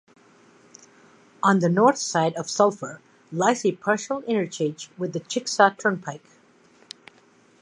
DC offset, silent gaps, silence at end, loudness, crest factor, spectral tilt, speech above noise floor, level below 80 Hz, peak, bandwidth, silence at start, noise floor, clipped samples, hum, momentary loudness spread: under 0.1%; none; 1.45 s; -23 LUFS; 22 dB; -4.5 dB/octave; 34 dB; -76 dBFS; -2 dBFS; 11 kHz; 1.45 s; -57 dBFS; under 0.1%; none; 18 LU